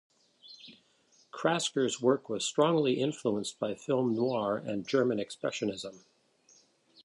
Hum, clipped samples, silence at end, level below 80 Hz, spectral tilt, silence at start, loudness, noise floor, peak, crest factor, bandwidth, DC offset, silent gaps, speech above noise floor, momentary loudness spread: none; under 0.1%; 1.05 s; -74 dBFS; -4.5 dB/octave; 0.45 s; -31 LUFS; -67 dBFS; -14 dBFS; 18 dB; 11.5 kHz; under 0.1%; none; 36 dB; 14 LU